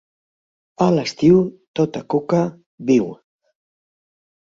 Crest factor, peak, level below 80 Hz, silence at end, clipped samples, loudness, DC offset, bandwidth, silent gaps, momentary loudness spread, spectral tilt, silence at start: 18 dB; -2 dBFS; -56 dBFS; 1.25 s; under 0.1%; -19 LUFS; under 0.1%; 7.6 kHz; 1.67-1.74 s, 2.66-2.78 s; 11 LU; -7.5 dB/octave; 0.8 s